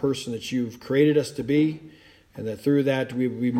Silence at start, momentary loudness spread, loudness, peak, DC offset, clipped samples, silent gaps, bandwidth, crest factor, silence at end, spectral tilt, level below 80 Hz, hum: 0 s; 10 LU; -24 LUFS; -8 dBFS; under 0.1%; under 0.1%; none; 15 kHz; 16 dB; 0 s; -6.5 dB/octave; -62 dBFS; none